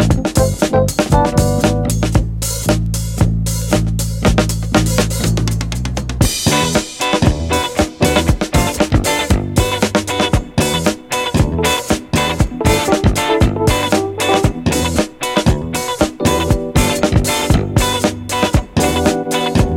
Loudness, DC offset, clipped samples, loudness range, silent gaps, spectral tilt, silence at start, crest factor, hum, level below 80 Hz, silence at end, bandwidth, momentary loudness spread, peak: -15 LUFS; under 0.1%; under 0.1%; 1 LU; none; -5 dB/octave; 0 s; 14 dB; none; -24 dBFS; 0 s; 17 kHz; 4 LU; 0 dBFS